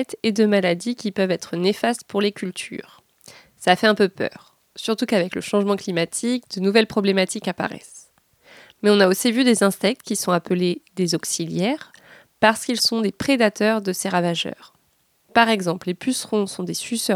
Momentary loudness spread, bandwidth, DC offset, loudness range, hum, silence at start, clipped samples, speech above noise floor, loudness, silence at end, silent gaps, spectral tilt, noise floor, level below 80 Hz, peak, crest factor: 9 LU; 17 kHz; under 0.1%; 3 LU; none; 0 s; under 0.1%; 44 dB; -21 LUFS; 0 s; none; -4 dB/octave; -64 dBFS; -64 dBFS; 0 dBFS; 22 dB